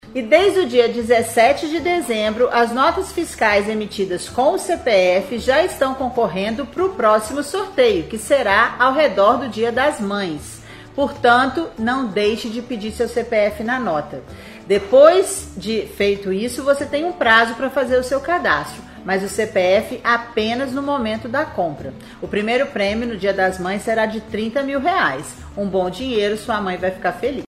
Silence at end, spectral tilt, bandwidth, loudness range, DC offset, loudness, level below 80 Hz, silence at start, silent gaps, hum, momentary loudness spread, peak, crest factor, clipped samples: 0 s; -4 dB/octave; 15 kHz; 4 LU; under 0.1%; -18 LUFS; -46 dBFS; 0.05 s; none; none; 10 LU; 0 dBFS; 18 dB; under 0.1%